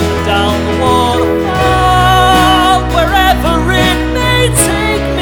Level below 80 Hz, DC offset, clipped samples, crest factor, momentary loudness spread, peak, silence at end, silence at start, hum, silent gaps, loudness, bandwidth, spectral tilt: -20 dBFS; under 0.1%; under 0.1%; 10 dB; 5 LU; 0 dBFS; 0 s; 0 s; none; none; -10 LUFS; over 20 kHz; -4.5 dB/octave